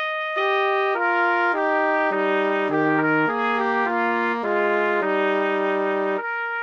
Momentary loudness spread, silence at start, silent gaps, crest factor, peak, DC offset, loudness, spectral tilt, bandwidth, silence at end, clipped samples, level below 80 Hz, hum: 3 LU; 0 s; none; 14 dB; -8 dBFS; under 0.1%; -21 LUFS; -6.5 dB/octave; 7 kHz; 0 s; under 0.1%; -64 dBFS; none